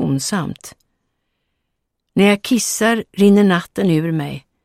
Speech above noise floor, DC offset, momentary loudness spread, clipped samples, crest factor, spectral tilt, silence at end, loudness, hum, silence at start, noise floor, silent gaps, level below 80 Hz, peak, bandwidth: 58 dB; under 0.1%; 12 LU; under 0.1%; 16 dB; -5 dB/octave; 0.25 s; -16 LUFS; none; 0 s; -74 dBFS; none; -56 dBFS; -2 dBFS; 15.5 kHz